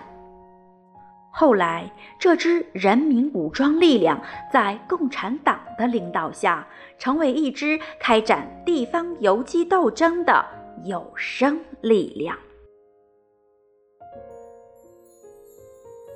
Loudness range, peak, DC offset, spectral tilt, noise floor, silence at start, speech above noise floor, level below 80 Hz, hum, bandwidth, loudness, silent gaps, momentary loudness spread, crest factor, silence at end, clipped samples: 7 LU; -4 dBFS; under 0.1%; -5 dB/octave; -61 dBFS; 0 s; 40 dB; -60 dBFS; none; 9.8 kHz; -21 LUFS; none; 13 LU; 18 dB; 0 s; under 0.1%